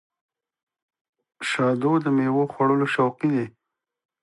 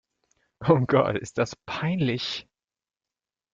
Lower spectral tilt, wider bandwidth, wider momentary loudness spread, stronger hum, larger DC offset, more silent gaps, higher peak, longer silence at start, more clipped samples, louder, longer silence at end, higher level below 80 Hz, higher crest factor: about the same, -6.5 dB/octave vs -6.5 dB/octave; first, 11.5 kHz vs 9 kHz; second, 7 LU vs 10 LU; neither; neither; neither; about the same, -8 dBFS vs -8 dBFS; first, 1.4 s vs 0.6 s; neither; about the same, -23 LUFS vs -25 LUFS; second, 0.75 s vs 1.15 s; second, -72 dBFS vs -58 dBFS; about the same, 16 dB vs 20 dB